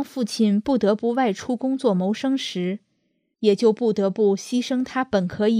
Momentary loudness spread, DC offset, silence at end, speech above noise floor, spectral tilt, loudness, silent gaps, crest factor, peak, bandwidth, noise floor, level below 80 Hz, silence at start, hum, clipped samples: 6 LU; under 0.1%; 0 s; 50 dB; -6 dB/octave; -22 LUFS; none; 16 dB; -6 dBFS; 14.5 kHz; -71 dBFS; -62 dBFS; 0 s; none; under 0.1%